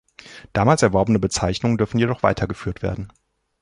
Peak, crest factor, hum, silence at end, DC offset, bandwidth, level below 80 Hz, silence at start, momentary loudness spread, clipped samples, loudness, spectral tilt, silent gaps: -2 dBFS; 18 dB; none; 0.55 s; under 0.1%; 11.5 kHz; -40 dBFS; 0.25 s; 12 LU; under 0.1%; -20 LUFS; -6 dB/octave; none